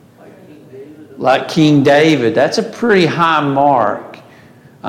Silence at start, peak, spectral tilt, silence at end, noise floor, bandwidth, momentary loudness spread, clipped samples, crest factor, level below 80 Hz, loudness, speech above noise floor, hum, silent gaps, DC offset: 0.75 s; 0 dBFS; -6 dB/octave; 0 s; -42 dBFS; 13.5 kHz; 7 LU; under 0.1%; 14 dB; -58 dBFS; -12 LUFS; 30 dB; none; none; under 0.1%